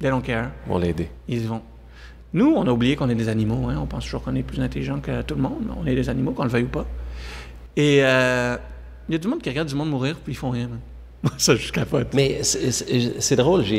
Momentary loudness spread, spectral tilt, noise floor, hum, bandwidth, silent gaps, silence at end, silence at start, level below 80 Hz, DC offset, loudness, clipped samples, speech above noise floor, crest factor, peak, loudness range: 12 LU; -5 dB/octave; -42 dBFS; none; 16 kHz; none; 0 s; 0 s; -38 dBFS; under 0.1%; -22 LUFS; under 0.1%; 21 dB; 20 dB; -4 dBFS; 3 LU